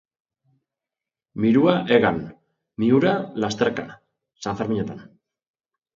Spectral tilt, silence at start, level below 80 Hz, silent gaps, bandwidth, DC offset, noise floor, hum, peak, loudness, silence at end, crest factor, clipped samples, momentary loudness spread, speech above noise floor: -6.5 dB/octave; 1.35 s; -58 dBFS; none; 7.6 kHz; under 0.1%; -89 dBFS; none; -2 dBFS; -21 LUFS; 0.9 s; 22 dB; under 0.1%; 21 LU; 68 dB